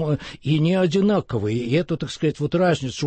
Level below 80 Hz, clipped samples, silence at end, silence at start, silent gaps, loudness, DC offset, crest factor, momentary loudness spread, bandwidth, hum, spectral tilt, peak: -52 dBFS; under 0.1%; 0 s; 0 s; none; -22 LUFS; under 0.1%; 12 dB; 6 LU; 8.8 kHz; none; -7 dB/octave; -10 dBFS